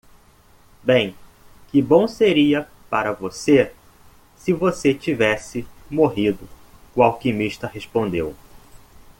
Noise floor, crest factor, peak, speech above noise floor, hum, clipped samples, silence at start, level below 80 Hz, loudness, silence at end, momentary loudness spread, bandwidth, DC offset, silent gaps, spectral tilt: -52 dBFS; 20 dB; -2 dBFS; 33 dB; none; under 0.1%; 0.85 s; -50 dBFS; -20 LUFS; 0.1 s; 12 LU; 17 kHz; under 0.1%; none; -6 dB/octave